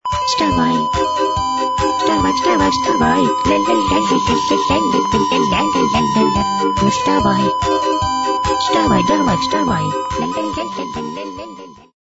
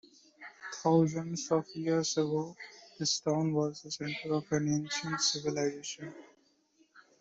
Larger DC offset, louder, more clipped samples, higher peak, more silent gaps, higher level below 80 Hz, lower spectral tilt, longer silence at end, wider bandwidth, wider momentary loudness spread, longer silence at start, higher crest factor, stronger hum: neither; first, -16 LUFS vs -32 LUFS; neither; first, -2 dBFS vs -14 dBFS; neither; first, -36 dBFS vs -74 dBFS; about the same, -4.5 dB/octave vs -4.5 dB/octave; first, 0.35 s vs 0.2 s; about the same, 8 kHz vs 8.2 kHz; second, 6 LU vs 16 LU; second, 0.05 s vs 0.4 s; about the same, 14 dB vs 18 dB; neither